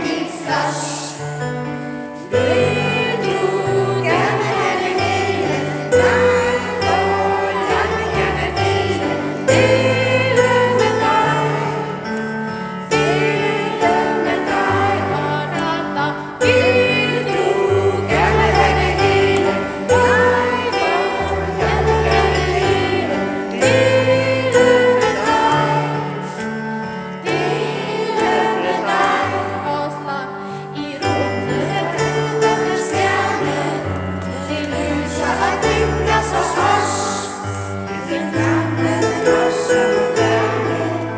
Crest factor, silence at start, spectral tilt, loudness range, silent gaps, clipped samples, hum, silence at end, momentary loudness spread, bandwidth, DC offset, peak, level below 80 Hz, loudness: 16 dB; 0 s; -5 dB/octave; 4 LU; none; under 0.1%; none; 0 s; 10 LU; 8 kHz; under 0.1%; 0 dBFS; -36 dBFS; -17 LUFS